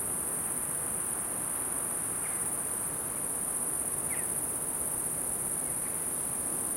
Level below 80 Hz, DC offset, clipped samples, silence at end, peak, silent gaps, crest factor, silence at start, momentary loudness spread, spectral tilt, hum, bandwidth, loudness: -58 dBFS; under 0.1%; under 0.1%; 0 s; -18 dBFS; none; 16 dB; 0 s; 1 LU; -2 dB/octave; none; 16.5 kHz; -30 LUFS